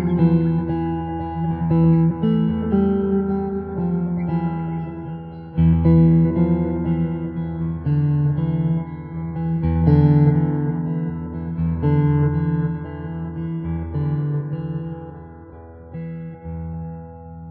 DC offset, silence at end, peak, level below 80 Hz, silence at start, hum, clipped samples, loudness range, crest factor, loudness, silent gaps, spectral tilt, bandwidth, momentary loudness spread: under 0.1%; 0 s; -4 dBFS; -36 dBFS; 0 s; none; under 0.1%; 8 LU; 16 dB; -20 LUFS; none; -10.5 dB/octave; 3.5 kHz; 17 LU